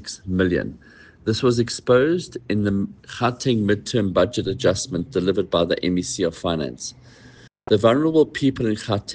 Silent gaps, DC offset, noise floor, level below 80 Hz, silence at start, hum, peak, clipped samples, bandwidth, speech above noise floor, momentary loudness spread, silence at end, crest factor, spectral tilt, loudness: none; under 0.1%; -48 dBFS; -48 dBFS; 0 s; none; -4 dBFS; under 0.1%; 10 kHz; 27 dB; 9 LU; 0 s; 18 dB; -5.5 dB/octave; -21 LUFS